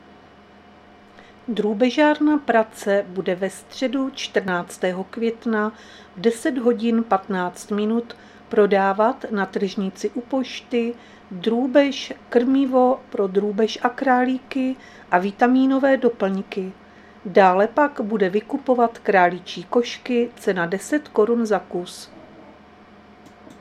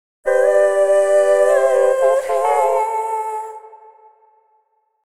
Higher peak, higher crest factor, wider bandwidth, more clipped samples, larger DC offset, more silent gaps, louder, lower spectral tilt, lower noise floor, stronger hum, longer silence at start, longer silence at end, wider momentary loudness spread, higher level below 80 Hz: about the same, -2 dBFS vs -2 dBFS; first, 20 dB vs 14 dB; about the same, 13.5 kHz vs 13.5 kHz; neither; neither; neither; second, -21 LUFS vs -16 LUFS; first, -5.5 dB/octave vs -1.5 dB/octave; second, -48 dBFS vs -63 dBFS; neither; first, 1.5 s vs 0.25 s; second, 1.1 s vs 1.3 s; about the same, 11 LU vs 10 LU; about the same, -62 dBFS vs -64 dBFS